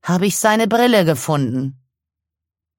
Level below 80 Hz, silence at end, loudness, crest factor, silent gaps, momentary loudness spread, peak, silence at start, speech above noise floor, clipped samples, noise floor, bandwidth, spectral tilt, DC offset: -60 dBFS; 1.05 s; -16 LUFS; 16 dB; none; 9 LU; -2 dBFS; 0.05 s; 69 dB; under 0.1%; -85 dBFS; 17 kHz; -5 dB/octave; under 0.1%